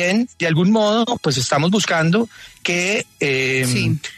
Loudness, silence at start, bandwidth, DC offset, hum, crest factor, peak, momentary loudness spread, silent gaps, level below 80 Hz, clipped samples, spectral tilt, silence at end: -18 LUFS; 0 s; 13.5 kHz; under 0.1%; none; 14 dB; -4 dBFS; 4 LU; none; -52 dBFS; under 0.1%; -4.5 dB/octave; 0.05 s